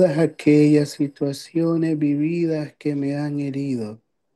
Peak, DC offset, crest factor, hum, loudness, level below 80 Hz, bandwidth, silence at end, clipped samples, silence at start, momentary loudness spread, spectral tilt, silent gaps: -4 dBFS; under 0.1%; 16 dB; none; -21 LUFS; -68 dBFS; 12.5 kHz; 0.4 s; under 0.1%; 0 s; 10 LU; -7.5 dB/octave; none